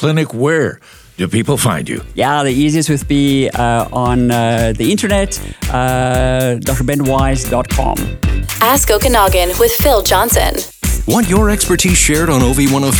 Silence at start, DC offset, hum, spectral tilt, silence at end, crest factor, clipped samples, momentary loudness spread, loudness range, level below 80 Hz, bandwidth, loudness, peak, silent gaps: 0 s; under 0.1%; none; -4.5 dB/octave; 0 s; 12 dB; under 0.1%; 8 LU; 3 LU; -22 dBFS; over 20 kHz; -13 LUFS; 0 dBFS; none